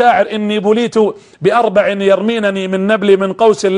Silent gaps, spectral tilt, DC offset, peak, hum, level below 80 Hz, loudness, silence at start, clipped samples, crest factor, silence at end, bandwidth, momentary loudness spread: none; -5.5 dB/octave; under 0.1%; 0 dBFS; none; -56 dBFS; -13 LUFS; 0 s; under 0.1%; 12 dB; 0 s; 10.5 kHz; 5 LU